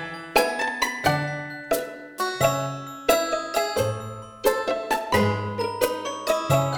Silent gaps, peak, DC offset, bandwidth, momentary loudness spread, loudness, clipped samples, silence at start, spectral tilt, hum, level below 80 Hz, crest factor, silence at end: none; -4 dBFS; under 0.1%; over 20 kHz; 7 LU; -25 LUFS; under 0.1%; 0 s; -4.5 dB/octave; none; -52 dBFS; 20 dB; 0 s